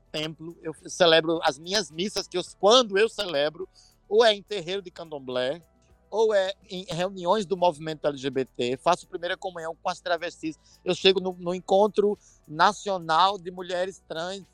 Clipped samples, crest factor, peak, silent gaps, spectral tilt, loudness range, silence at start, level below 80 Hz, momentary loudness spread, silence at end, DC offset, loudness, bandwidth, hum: under 0.1%; 24 dB; -2 dBFS; none; -3.5 dB/octave; 4 LU; 0.15 s; -62 dBFS; 15 LU; 0.1 s; under 0.1%; -25 LUFS; 17 kHz; none